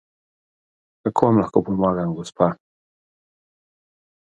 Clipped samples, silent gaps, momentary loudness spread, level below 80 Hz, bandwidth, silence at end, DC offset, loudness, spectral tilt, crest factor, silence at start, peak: under 0.1%; none; 10 LU; -54 dBFS; 11 kHz; 1.75 s; under 0.1%; -21 LUFS; -8.5 dB/octave; 24 dB; 1.05 s; 0 dBFS